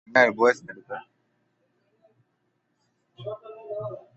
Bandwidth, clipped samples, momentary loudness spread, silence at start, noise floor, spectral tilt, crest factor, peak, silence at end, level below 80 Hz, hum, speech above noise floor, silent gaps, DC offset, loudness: 8.2 kHz; under 0.1%; 20 LU; 0.1 s; -74 dBFS; -5 dB/octave; 24 dB; -4 dBFS; 0.2 s; -74 dBFS; none; 49 dB; none; under 0.1%; -23 LUFS